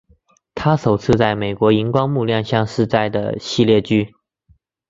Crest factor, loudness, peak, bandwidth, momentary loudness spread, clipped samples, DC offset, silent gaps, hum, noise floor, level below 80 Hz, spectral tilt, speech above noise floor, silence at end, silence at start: 16 dB; -17 LUFS; -2 dBFS; 7.8 kHz; 7 LU; under 0.1%; under 0.1%; none; none; -57 dBFS; -46 dBFS; -7 dB/octave; 41 dB; 0.8 s; 0.55 s